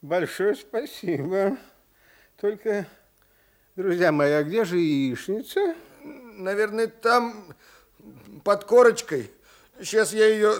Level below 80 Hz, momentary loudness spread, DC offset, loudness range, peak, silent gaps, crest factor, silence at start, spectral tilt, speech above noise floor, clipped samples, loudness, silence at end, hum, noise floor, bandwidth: -68 dBFS; 18 LU; under 0.1%; 5 LU; -6 dBFS; none; 20 dB; 0.05 s; -5 dB/octave; 38 dB; under 0.1%; -24 LUFS; 0 s; none; -62 dBFS; 17 kHz